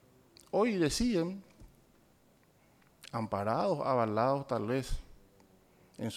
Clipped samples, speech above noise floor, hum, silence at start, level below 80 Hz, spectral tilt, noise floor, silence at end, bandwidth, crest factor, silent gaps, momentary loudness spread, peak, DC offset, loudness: under 0.1%; 35 dB; none; 0.55 s; -50 dBFS; -5.5 dB/octave; -66 dBFS; 0 s; 16 kHz; 18 dB; none; 13 LU; -16 dBFS; under 0.1%; -33 LUFS